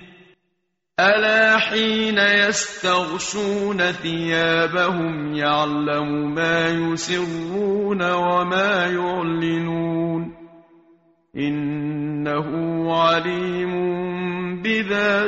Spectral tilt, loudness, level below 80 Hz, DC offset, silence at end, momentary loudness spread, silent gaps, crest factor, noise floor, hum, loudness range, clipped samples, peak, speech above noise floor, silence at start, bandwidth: -3 dB/octave; -20 LUFS; -56 dBFS; under 0.1%; 0 s; 9 LU; none; 16 dB; -74 dBFS; none; 7 LU; under 0.1%; -4 dBFS; 54 dB; 0 s; 8 kHz